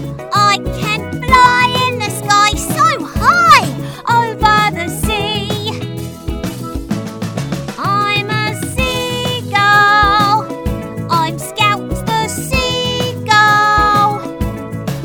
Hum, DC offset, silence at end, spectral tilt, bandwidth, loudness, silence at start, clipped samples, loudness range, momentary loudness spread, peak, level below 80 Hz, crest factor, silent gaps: none; under 0.1%; 0 s; -4 dB/octave; over 20 kHz; -13 LUFS; 0 s; under 0.1%; 7 LU; 13 LU; 0 dBFS; -30 dBFS; 14 dB; none